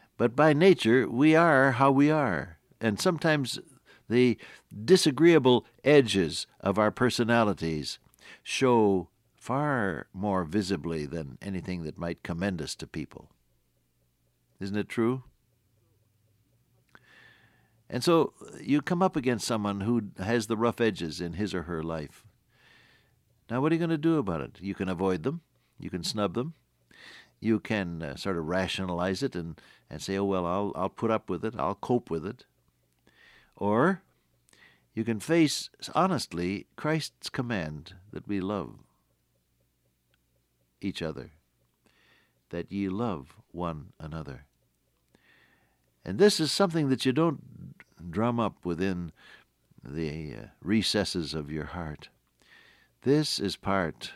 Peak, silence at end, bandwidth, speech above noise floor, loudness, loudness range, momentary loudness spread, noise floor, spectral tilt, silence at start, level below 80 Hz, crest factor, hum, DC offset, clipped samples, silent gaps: -8 dBFS; 0 s; 15.5 kHz; 45 dB; -28 LUFS; 13 LU; 18 LU; -72 dBFS; -5.5 dB/octave; 0.2 s; -60 dBFS; 20 dB; none; under 0.1%; under 0.1%; none